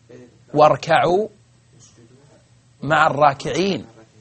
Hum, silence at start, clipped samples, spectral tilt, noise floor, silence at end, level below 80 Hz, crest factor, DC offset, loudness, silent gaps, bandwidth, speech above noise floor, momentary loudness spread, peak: none; 0.1 s; under 0.1%; -5.5 dB/octave; -53 dBFS; 0.35 s; -54 dBFS; 20 dB; under 0.1%; -18 LUFS; none; 8.8 kHz; 35 dB; 13 LU; 0 dBFS